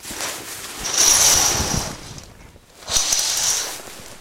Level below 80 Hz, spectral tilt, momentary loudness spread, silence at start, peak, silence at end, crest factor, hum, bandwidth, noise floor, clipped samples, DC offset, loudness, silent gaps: -40 dBFS; 0 dB/octave; 20 LU; 0 s; 0 dBFS; 0 s; 20 dB; none; 16.5 kHz; -45 dBFS; under 0.1%; under 0.1%; -17 LUFS; none